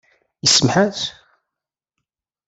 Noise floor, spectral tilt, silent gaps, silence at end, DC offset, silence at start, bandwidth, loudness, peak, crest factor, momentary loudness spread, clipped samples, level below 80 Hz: -86 dBFS; -3 dB/octave; none; 1.35 s; under 0.1%; 0.45 s; 8.4 kHz; -16 LUFS; -2 dBFS; 20 dB; 13 LU; under 0.1%; -56 dBFS